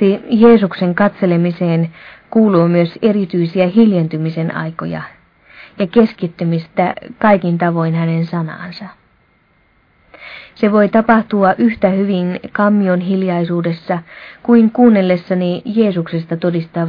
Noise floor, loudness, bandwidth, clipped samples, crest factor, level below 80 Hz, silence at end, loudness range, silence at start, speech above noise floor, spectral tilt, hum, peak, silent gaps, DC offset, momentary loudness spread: -55 dBFS; -14 LUFS; 5.2 kHz; under 0.1%; 14 dB; -52 dBFS; 0 s; 4 LU; 0 s; 41 dB; -10.5 dB/octave; none; 0 dBFS; none; under 0.1%; 12 LU